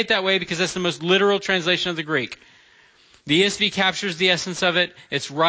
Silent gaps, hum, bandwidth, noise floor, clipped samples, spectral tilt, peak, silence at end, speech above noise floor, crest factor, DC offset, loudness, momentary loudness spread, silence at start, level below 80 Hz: none; none; 8 kHz; -54 dBFS; under 0.1%; -3.5 dB/octave; -6 dBFS; 0 s; 33 dB; 16 dB; under 0.1%; -20 LUFS; 7 LU; 0 s; -60 dBFS